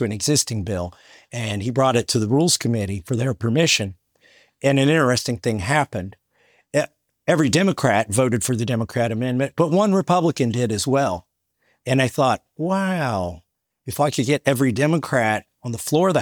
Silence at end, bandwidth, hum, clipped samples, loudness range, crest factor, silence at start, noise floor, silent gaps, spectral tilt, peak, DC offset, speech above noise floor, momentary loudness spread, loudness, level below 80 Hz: 0 s; over 20 kHz; none; under 0.1%; 2 LU; 18 dB; 0 s; -67 dBFS; none; -5 dB/octave; -2 dBFS; under 0.1%; 47 dB; 11 LU; -20 LUFS; -58 dBFS